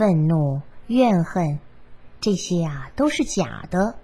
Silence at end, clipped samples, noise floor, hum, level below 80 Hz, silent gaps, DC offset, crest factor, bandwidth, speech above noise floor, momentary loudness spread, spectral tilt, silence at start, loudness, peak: 0 s; under 0.1%; -43 dBFS; none; -46 dBFS; none; 0.7%; 18 dB; 12 kHz; 23 dB; 9 LU; -6.5 dB/octave; 0 s; -22 LUFS; -4 dBFS